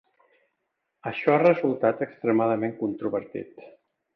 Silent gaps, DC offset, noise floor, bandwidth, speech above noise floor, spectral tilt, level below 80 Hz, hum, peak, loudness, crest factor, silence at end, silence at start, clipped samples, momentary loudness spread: none; under 0.1%; -79 dBFS; 5.8 kHz; 55 dB; -9.5 dB/octave; -72 dBFS; none; -8 dBFS; -25 LUFS; 20 dB; 0.45 s; 1.05 s; under 0.1%; 17 LU